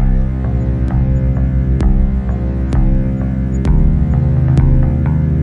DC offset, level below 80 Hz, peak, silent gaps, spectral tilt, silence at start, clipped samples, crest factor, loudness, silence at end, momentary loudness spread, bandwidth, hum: under 0.1%; -16 dBFS; 0 dBFS; none; -10 dB/octave; 0 s; under 0.1%; 12 dB; -15 LUFS; 0 s; 5 LU; 7.2 kHz; none